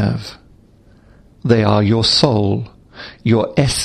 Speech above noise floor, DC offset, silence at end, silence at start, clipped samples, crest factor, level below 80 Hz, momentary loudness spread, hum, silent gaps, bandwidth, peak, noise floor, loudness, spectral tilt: 33 dB; under 0.1%; 0 s; 0 s; under 0.1%; 16 dB; -40 dBFS; 21 LU; none; none; 13 kHz; 0 dBFS; -48 dBFS; -15 LUFS; -5.5 dB/octave